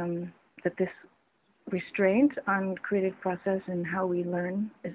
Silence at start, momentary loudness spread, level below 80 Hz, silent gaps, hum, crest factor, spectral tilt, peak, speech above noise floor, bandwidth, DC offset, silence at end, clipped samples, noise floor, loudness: 0 s; 10 LU; -68 dBFS; none; none; 18 dB; -7 dB/octave; -12 dBFS; 41 dB; 4 kHz; under 0.1%; 0 s; under 0.1%; -70 dBFS; -30 LUFS